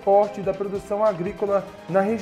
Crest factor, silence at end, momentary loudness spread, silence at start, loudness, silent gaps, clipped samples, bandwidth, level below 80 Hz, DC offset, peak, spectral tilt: 16 dB; 0 s; 8 LU; 0 s; -24 LUFS; none; under 0.1%; 12 kHz; -54 dBFS; under 0.1%; -6 dBFS; -7.5 dB/octave